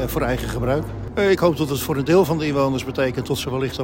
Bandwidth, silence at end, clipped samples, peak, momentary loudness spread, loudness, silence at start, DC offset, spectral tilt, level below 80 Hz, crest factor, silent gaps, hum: 16.5 kHz; 0 s; under 0.1%; -4 dBFS; 7 LU; -21 LUFS; 0 s; under 0.1%; -6 dB/octave; -38 dBFS; 16 dB; none; none